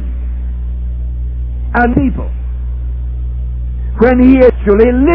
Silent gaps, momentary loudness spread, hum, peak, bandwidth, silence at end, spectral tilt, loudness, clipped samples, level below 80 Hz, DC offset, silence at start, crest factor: none; 14 LU; 60 Hz at -20 dBFS; 0 dBFS; 4.5 kHz; 0 s; -11 dB/octave; -13 LUFS; 0.8%; -18 dBFS; 1%; 0 s; 12 dB